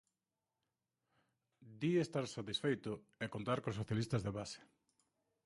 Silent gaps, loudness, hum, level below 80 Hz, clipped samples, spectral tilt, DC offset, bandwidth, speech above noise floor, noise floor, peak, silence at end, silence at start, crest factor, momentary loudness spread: none; -40 LUFS; none; -68 dBFS; under 0.1%; -6 dB/octave; under 0.1%; 11.5 kHz; over 50 dB; under -90 dBFS; -22 dBFS; 0.8 s; 1.6 s; 20 dB; 10 LU